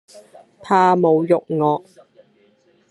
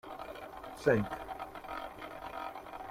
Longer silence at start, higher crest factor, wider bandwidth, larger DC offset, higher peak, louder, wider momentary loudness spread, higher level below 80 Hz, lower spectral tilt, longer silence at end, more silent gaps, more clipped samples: about the same, 0.15 s vs 0.05 s; second, 18 dB vs 24 dB; second, 11.5 kHz vs 16 kHz; neither; first, -2 dBFS vs -14 dBFS; first, -17 LUFS vs -38 LUFS; second, 6 LU vs 15 LU; second, -70 dBFS vs -60 dBFS; about the same, -7.5 dB/octave vs -6.5 dB/octave; first, 1.1 s vs 0 s; neither; neither